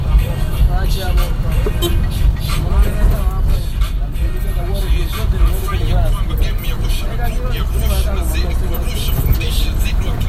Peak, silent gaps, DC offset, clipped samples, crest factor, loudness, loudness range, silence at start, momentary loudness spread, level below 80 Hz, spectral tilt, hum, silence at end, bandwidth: 0 dBFS; none; under 0.1%; under 0.1%; 14 dB; -19 LUFS; 2 LU; 0 s; 4 LU; -16 dBFS; -5.5 dB/octave; none; 0 s; 15.5 kHz